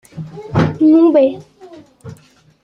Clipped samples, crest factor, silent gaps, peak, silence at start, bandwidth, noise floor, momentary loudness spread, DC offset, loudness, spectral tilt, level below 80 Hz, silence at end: under 0.1%; 14 dB; none; -2 dBFS; 0.15 s; 6.8 kHz; -47 dBFS; 22 LU; under 0.1%; -12 LUFS; -9 dB/octave; -50 dBFS; 0.5 s